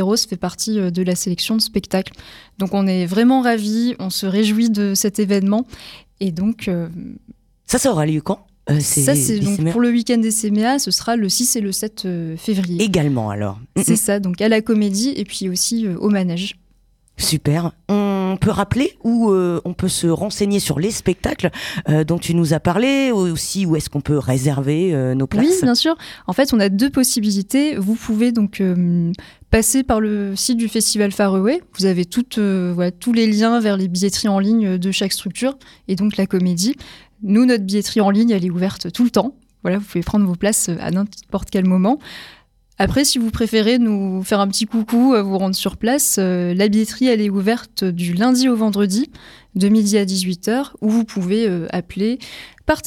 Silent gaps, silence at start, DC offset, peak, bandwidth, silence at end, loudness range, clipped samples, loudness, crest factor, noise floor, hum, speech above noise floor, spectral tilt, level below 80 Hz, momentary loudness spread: none; 0 s; under 0.1%; -2 dBFS; 17.5 kHz; 0 s; 3 LU; under 0.1%; -18 LUFS; 16 dB; -56 dBFS; none; 39 dB; -5 dB/octave; -42 dBFS; 8 LU